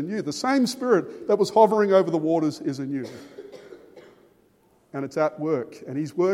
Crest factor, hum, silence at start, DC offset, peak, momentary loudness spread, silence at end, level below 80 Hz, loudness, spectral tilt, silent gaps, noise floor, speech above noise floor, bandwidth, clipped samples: 20 dB; none; 0 s; under 0.1%; -4 dBFS; 19 LU; 0 s; -74 dBFS; -23 LUFS; -6 dB/octave; none; -61 dBFS; 38 dB; 16 kHz; under 0.1%